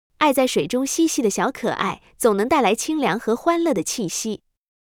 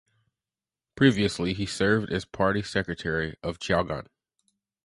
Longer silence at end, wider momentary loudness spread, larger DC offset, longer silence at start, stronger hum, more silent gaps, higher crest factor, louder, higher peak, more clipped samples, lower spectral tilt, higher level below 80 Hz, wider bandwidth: second, 0.5 s vs 0.8 s; second, 7 LU vs 10 LU; neither; second, 0.2 s vs 0.95 s; neither; neither; second, 16 dB vs 24 dB; first, -21 LUFS vs -26 LUFS; about the same, -4 dBFS vs -4 dBFS; neither; second, -3.5 dB/octave vs -5.5 dB/octave; second, -56 dBFS vs -50 dBFS; first, 18.5 kHz vs 11.5 kHz